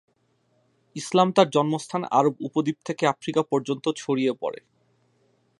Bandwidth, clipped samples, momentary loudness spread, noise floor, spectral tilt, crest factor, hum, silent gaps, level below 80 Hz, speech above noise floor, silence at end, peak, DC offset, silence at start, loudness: 11.5 kHz; under 0.1%; 12 LU; -68 dBFS; -5.5 dB/octave; 22 dB; none; none; -74 dBFS; 44 dB; 1.05 s; -2 dBFS; under 0.1%; 0.95 s; -24 LUFS